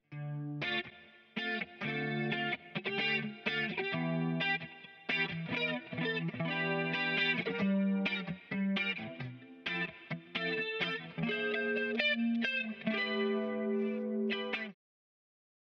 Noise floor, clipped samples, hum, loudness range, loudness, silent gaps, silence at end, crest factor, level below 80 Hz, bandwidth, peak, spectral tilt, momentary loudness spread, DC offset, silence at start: -56 dBFS; under 0.1%; none; 3 LU; -34 LUFS; none; 1 s; 18 dB; -76 dBFS; 6.6 kHz; -18 dBFS; -7 dB/octave; 8 LU; under 0.1%; 0.1 s